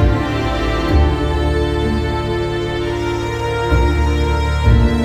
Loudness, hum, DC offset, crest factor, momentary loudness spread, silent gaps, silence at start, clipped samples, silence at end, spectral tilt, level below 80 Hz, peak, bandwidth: -17 LUFS; none; under 0.1%; 14 dB; 5 LU; none; 0 s; under 0.1%; 0 s; -7 dB/octave; -18 dBFS; -2 dBFS; 10 kHz